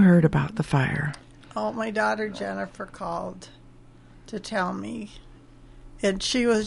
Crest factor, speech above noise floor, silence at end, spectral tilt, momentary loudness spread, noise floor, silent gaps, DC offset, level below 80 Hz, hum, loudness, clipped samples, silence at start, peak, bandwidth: 20 dB; 24 dB; 0 s; -6 dB/octave; 15 LU; -49 dBFS; none; under 0.1%; -50 dBFS; none; -26 LUFS; under 0.1%; 0 s; -6 dBFS; 11.5 kHz